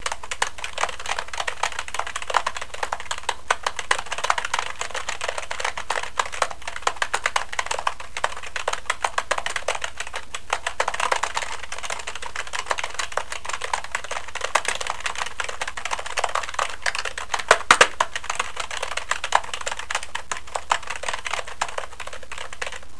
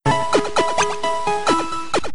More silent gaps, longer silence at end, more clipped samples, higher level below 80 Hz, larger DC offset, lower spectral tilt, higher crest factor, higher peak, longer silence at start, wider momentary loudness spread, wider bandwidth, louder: neither; about the same, 0 s vs 0 s; neither; about the same, -48 dBFS vs -44 dBFS; about the same, 3% vs 4%; second, 0 dB/octave vs -4 dB/octave; first, 28 dB vs 16 dB; first, 0 dBFS vs -4 dBFS; about the same, 0 s vs 0 s; first, 7 LU vs 4 LU; about the same, 11 kHz vs 11 kHz; second, -26 LUFS vs -20 LUFS